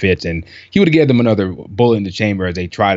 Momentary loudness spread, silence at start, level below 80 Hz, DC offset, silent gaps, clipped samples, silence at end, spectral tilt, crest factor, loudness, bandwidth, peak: 10 LU; 0 s; -42 dBFS; under 0.1%; none; under 0.1%; 0 s; -7.5 dB/octave; 14 dB; -15 LUFS; 7.8 kHz; 0 dBFS